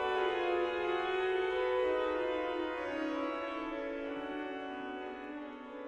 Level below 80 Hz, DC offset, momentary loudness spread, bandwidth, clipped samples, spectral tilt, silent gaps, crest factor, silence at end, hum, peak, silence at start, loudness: -64 dBFS; under 0.1%; 10 LU; 8.6 kHz; under 0.1%; -5 dB/octave; none; 14 dB; 0 s; none; -22 dBFS; 0 s; -36 LUFS